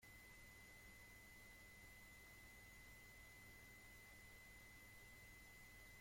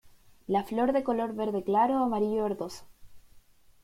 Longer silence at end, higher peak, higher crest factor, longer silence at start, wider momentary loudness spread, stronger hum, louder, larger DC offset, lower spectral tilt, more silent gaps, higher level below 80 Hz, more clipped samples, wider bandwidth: second, 0 s vs 0.45 s; second, -50 dBFS vs -14 dBFS; about the same, 12 dB vs 16 dB; about the same, 0 s vs 0.05 s; second, 0 LU vs 12 LU; neither; second, -62 LUFS vs -29 LUFS; neither; second, -3 dB/octave vs -7 dB/octave; neither; second, -72 dBFS vs -60 dBFS; neither; about the same, 16.5 kHz vs 16 kHz